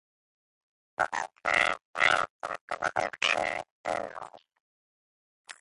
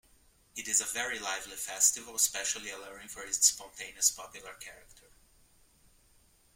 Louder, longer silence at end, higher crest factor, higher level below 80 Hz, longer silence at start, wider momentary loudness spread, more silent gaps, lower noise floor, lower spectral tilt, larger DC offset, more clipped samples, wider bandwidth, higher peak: about the same, -29 LUFS vs -29 LUFS; second, 0.1 s vs 1.55 s; about the same, 24 dB vs 26 dB; about the same, -66 dBFS vs -66 dBFS; first, 1 s vs 0.55 s; second, 16 LU vs 20 LU; first, 1.85-1.94 s, 2.30-2.40 s, 2.61-2.68 s, 3.71-3.84 s, 4.60-5.45 s vs none; first, under -90 dBFS vs -65 dBFS; first, -1.5 dB/octave vs 2 dB/octave; neither; neither; second, 11.5 kHz vs 16.5 kHz; about the same, -8 dBFS vs -8 dBFS